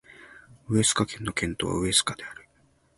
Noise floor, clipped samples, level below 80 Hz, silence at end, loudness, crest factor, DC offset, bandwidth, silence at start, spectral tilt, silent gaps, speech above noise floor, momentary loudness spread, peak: -64 dBFS; under 0.1%; -50 dBFS; 0.55 s; -25 LUFS; 22 dB; under 0.1%; 11.5 kHz; 0.2 s; -3 dB/octave; none; 38 dB; 11 LU; -8 dBFS